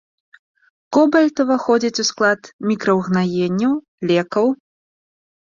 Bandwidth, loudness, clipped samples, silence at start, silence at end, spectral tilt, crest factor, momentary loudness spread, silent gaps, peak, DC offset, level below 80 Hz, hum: 7.6 kHz; -18 LUFS; under 0.1%; 0.9 s; 0.95 s; -5 dB/octave; 16 dB; 6 LU; 2.53-2.59 s, 3.88-3.98 s; -2 dBFS; under 0.1%; -62 dBFS; none